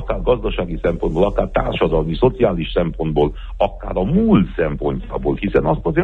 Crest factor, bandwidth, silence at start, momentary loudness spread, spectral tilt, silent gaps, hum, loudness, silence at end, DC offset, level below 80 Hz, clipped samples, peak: 16 dB; 4.5 kHz; 0 s; 6 LU; -9.5 dB/octave; none; none; -19 LUFS; 0 s; under 0.1%; -28 dBFS; under 0.1%; -2 dBFS